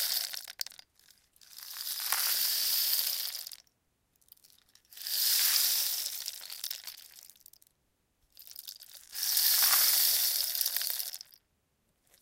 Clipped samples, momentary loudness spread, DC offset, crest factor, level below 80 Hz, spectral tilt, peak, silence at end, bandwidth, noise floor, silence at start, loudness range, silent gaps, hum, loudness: under 0.1%; 22 LU; under 0.1%; 26 dB; -80 dBFS; 4.5 dB/octave; -8 dBFS; 1.05 s; 17 kHz; -76 dBFS; 0 s; 7 LU; none; none; -27 LUFS